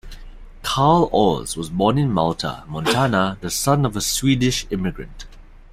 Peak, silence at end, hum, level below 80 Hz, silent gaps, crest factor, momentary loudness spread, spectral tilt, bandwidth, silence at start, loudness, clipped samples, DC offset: -2 dBFS; 0.15 s; none; -38 dBFS; none; 18 dB; 11 LU; -5 dB/octave; 16 kHz; 0.05 s; -20 LUFS; under 0.1%; under 0.1%